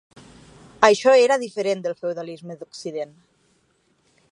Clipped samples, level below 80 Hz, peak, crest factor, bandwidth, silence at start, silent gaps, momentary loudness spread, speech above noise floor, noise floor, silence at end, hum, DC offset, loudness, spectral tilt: under 0.1%; -64 dBFS; 0 dBFS; 22 dB; 11 kHz; 0.8 s; none; 20 LU; 44 dB; -65 dBFS; 1.25 s; none; under 0.1%; -20 LUFS; -3.5 dB/octave